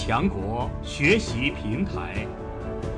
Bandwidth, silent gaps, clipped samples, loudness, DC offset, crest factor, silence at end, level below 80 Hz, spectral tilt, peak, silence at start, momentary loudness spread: 10.5 kHz; none; under 0.1%; -26 LUFS; under 0.1%; 18 dB; 0 s; -36 dBFS; -5.5 dB/octave; -8 dBFS; 0 s; 12 LU